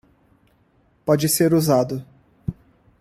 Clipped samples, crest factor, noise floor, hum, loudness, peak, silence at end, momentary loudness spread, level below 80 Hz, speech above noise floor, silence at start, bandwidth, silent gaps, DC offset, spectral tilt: under 0.1%; 18 dB; -60 dBFS; none; -20 LUFS; -4 dBFS; 0.5 s; 16 LU; -52 dBFS; 42 dB; 1.05 s; 16 kHz; none; under 0.1%; -5.5 dB/octave